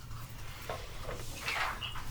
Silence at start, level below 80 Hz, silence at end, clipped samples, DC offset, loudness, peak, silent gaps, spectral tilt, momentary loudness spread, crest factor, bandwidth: 0 s; -46 dBFS; 0 s; under 0.1%; under 0.1%; -39 LUFS; -20 dBFS; none; -3 dB/octave; 12 LU; 18 dB; over 20 kHz